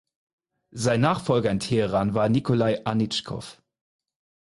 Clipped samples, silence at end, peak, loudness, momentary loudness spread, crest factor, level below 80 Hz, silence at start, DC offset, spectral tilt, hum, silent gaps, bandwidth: under 0.1%; 0.95 s; -8 dBFS; -24 LUFS; 14 LU; 18 dB; -54 dBFS; 0.75 s; under 0.1%; -6 dB/octave; none; none; 11.5 kHz